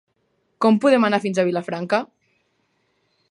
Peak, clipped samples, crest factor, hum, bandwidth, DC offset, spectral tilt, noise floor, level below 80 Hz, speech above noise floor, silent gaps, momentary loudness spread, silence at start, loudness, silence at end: -4 dBFS; under 0.1%; 18 dB; none; 11 kHz; under 0.1%; -6 dB/octave; -69 dBFS; -74 dBFS; 50 dB; none; 9 LU; 0.6 s; -20 LUFS; 1.25 s